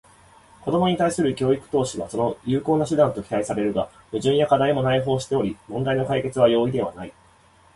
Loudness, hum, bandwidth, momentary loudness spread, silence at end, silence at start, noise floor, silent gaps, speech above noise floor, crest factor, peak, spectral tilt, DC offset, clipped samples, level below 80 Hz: -22 LUFS; none; 11.5 kHz; 9 LU; 0.65 s; 0.65 s; -55 dBFS; none; 33 dB; 18 dB; -4 dBFS; -6 dB/octave; under 0.1%; under 0.1%; -52 dBFS